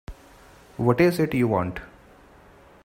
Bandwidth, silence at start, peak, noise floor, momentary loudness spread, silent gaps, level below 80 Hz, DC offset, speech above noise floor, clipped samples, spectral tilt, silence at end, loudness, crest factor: 16 kHz; 0.1 s; -4 dBFS; -51 dBFS; 22 LU; none; -50 dBFS; under 0.1%; 30 dB; under 0.1%; -7.5 dB/octave; 1 s; -23 LUFS; 22 dB